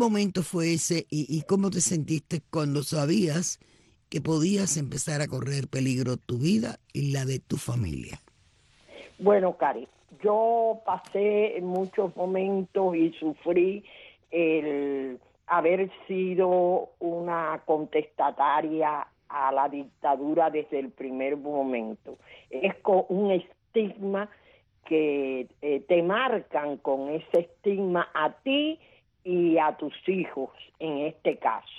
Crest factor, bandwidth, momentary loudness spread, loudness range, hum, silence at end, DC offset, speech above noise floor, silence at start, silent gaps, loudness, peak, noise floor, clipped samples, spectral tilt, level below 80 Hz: 18 dB; 12.5 kHz; 9 LU; 2 LU; none; 0 s; under 0.1%; 35 dB; 0 s; none; -27 LUFS; -8 dBFS; -62 dBFS; under 0.1%; -5.5 dB/octave; -62 dBFS